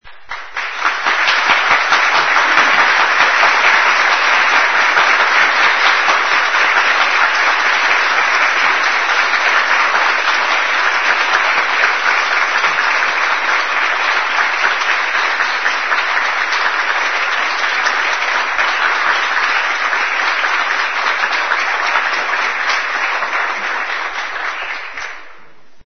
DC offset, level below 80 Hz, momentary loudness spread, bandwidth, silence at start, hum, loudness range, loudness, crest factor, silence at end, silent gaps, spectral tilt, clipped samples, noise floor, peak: 2%; -58 dBFS; 7 LU; 6.6 kHz; 0 s; none; 5 LU; -13 LUFS; 14 dB; 0 s; none; 0.5 dB/octave; under 0.1%; -45 dBFS; 0 dBFS